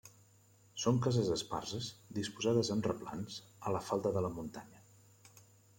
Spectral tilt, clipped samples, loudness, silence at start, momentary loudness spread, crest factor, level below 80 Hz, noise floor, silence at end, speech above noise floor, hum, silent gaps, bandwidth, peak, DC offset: -5.5 dB/octave; under 0.1%; -36 LUFS; 0.05 s; 13 LU; 20 dB; -68 dBFS; -65 dBFS; 0.35 s; 30 dB; none; none; 16.5 kHz; -18 dBFS; under 0.1%